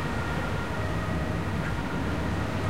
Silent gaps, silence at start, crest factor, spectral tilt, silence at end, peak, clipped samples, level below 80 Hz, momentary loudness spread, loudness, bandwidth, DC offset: none; 0 s; 12 dB; -6.5 dB/octave; 0 s; -16 dBFS; under 0.1%; -38 dBFS; 1 LU; -30 LUFS; 16 kHz; 1%